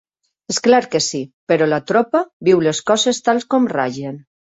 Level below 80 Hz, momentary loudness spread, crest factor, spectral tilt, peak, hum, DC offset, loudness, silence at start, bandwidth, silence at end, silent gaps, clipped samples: -60 dBFS; 9 LU; 16 dB; -4 dB/octave; 0 dBFS; none; under 0.1%; -17 LUFS; 0.5 s; 8.2 kHz; 0.35 s; 1.33-1.47 s, 2.33-2.40 s; under 0.1%